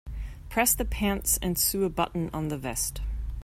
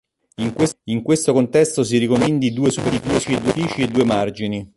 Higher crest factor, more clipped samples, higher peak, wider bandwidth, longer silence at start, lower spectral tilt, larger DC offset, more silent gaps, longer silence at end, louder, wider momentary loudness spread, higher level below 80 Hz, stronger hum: about the same, 20 dB vs 16 dB; neither; second, -8 dBFS vs -4 dBFS; first, 16 kHz vs 11.5 kHz; second, 0.05 s vs 0.4 s; second, -3.5 dB/octave vs -5.5 dB/octave; neither; neither; about the same, 0 s vs 0.1 s; second, -27 LUFS vs -19 LUFS; first, 12 LU vs 7 LU; first, -36 dBFS vs -48 dBFS; neither